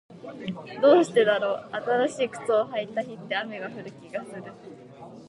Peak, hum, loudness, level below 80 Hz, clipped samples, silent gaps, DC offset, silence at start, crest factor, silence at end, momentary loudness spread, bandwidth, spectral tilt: -8 dBFS; none; -25 LUFS; -74 dBFS; under 0.1%; none; under 0.1%; 0.1 s; 20 dB; 0 s; 24 LU; 11 kHz; -5 dB/octave